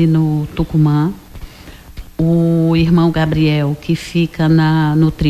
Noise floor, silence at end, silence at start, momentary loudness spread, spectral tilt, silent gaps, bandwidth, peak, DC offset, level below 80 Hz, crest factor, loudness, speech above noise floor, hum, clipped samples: -36 dBFS; 0 s; 0 s; 7 LU; -8 dB/octave; none; 13 kHz; -2 dBFS; under 0.1%; -34 dBFS; 12 dB; -14 LUFS; 23 dB; none; under 0.1%